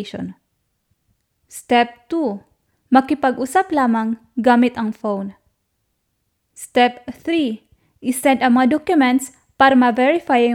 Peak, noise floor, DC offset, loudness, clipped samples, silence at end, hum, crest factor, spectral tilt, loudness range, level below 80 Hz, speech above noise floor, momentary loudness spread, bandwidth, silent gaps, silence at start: 0 dBFS; -71 dBFS; under 0.1%; -17 LUFS; under 0.1%; 0 s; none; 18 dB; -4.5 dB/octave; 5 LU; -60 dBFS; 54 dB; 17 LU; 15 kHz; none; 0 s